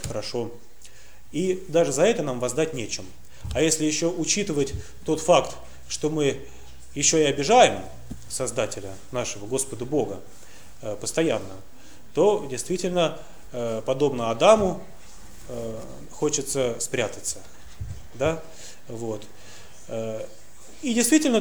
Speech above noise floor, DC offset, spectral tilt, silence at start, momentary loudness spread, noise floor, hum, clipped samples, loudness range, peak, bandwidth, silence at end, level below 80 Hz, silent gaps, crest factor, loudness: 26 dB; 1%; -3.5 dB/octave; 0 s; 20 LU; -50 dBFS; none; under 0.1%; 7 LU; -2 dBFS; over 20 kHz; 0 s; -50 dBFS; none; 22 dB; -24 LUFS